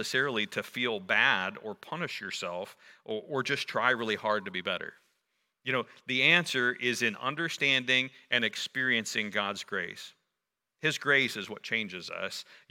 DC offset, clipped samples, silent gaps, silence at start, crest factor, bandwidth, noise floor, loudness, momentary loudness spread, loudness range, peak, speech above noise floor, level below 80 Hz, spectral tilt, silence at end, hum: under 0.1%; under 0.1%; none; 0 s; 24 dB; 17 kHz; -86 dBFS; -29 LUFS; 14 LU; 5 LU; -8 dBFS; 55 dB; -82 dBFS; -3 dB/octave; 0.15 s; none